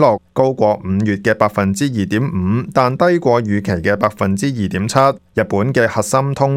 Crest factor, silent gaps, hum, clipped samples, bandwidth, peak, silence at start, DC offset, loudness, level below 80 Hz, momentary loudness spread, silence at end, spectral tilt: 16 dB; none; none; under 0.1%; 16 kHz; 0 dBFS; 0 s; under 0.1%; -16 LUFS; -46 dBFS; 4 LU; 0 s; -6.5 dB/octave